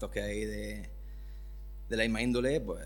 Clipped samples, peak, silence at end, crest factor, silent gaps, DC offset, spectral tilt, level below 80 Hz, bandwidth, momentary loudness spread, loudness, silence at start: under 0.1%; -14 dBFS; 0 s; 20 dB; none; under 0.1%; -5 dB/octave; -44 dBFS; 19 kHz; 18 LU; -33 LUFS; 0 s